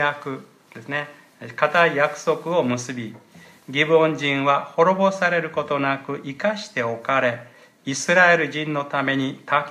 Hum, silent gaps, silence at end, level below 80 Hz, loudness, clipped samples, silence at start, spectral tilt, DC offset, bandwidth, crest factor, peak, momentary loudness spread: none; none; 0 s; -72 dBFS; -21 LUFS; under 0.1%; 0 s; -4.5 dB/octave; under 0.1%; 13.5 kHz; 20 dB; -2 dBFS; 16 LU